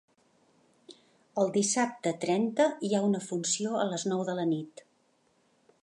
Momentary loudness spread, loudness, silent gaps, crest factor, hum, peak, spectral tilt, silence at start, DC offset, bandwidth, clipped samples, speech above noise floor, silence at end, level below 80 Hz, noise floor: 5 LU; -29 LUFS; none; 18 dB; none; -14 dBFS; -4 dB/octave; 0.9 s; under 0.1%; 11.5 kHz; under 0.1%; 41 dB; 1.15 s; -82 dBFS; -70 dBFS